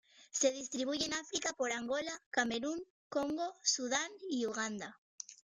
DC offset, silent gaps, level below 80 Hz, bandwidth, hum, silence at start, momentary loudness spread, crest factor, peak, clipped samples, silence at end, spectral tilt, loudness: under 0.1%; 2.26-2.31 s, 2.90-3.11 s, 4.98-5.18 s; -74 dBFS; 13 kHz; none; 0.2 s; 11 LU; 20 dB; -18 dBFS; under 0.1%; 0.2 s; -1.5 dB/octave; -36 LUFS